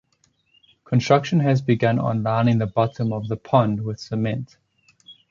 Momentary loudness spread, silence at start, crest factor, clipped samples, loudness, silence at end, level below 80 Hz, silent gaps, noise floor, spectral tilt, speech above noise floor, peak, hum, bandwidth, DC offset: 9 LU; 0.9 s; 18 dB; under 0.1%; -21 LUFS; 0.2 s; -56 dBFS; none; -65 dBFS; -7.5 dB/octave; 45 dB; -4 dBFS; none; 7.4 kHz; under 0.1%